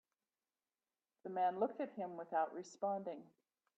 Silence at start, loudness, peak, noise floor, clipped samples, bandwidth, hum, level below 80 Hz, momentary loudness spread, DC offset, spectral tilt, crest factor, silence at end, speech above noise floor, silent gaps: 1.25 s; -42 LUFS; -26 dBFS; under -90 dBFS; under 0.1%; 8.4 kHz; none; under -90 dBFS; 12 LU; under 0.1%; -6 dB/octave; 18 dB; 0.55 s; over 49 dB; none